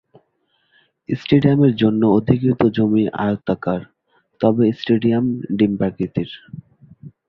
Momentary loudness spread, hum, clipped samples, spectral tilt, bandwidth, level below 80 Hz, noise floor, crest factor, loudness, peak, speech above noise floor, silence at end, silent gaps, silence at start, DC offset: 12 LU; none; under 0.1%; -10 dB/octave; 6 kHz; -50 dBFS; -66 dBFS; 18 dB; -18 LUFS; -2 dBFS; 49 dB; 0.2 s; none; 1.1 s; under 0.1%